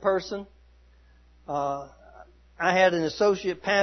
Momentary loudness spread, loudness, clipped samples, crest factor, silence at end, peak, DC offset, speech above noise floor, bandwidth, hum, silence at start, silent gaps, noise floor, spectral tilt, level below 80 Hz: 15 LU; -26 LUFS; under 0.1%; 20 dB; 0 s; -8 dBFS; under 0.1%; 31 dB; 6.4 kHz; none; 0 s; none; -56 dBFS; -4.5 dB/octave; -56 dBFS